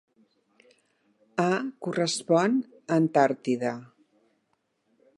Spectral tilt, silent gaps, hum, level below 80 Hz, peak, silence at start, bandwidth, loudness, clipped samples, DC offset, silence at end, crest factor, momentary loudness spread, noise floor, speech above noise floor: -5.5 dB/octave; none; none; -80 dBFS; -8 dBFS; 1.35 s; 11.5 kHz; -26 LUFS; under 0.1%; under 0.1%; 1.3 s; 22 dB; 9 LU; -74 dBFS; 49 dB